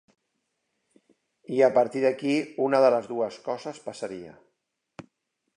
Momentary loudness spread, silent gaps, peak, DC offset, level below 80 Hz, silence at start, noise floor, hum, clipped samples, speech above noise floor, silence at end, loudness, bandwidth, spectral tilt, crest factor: 15 LU; none; -6 dBFS; under 0.1%; -76 dBFS; 1.5 s; -78 dBFS; none; under 0.1%; 54 dB; 1.25 s; -25 LUFS; 10.5 kHz; -5.5 dB/octave; 20 dB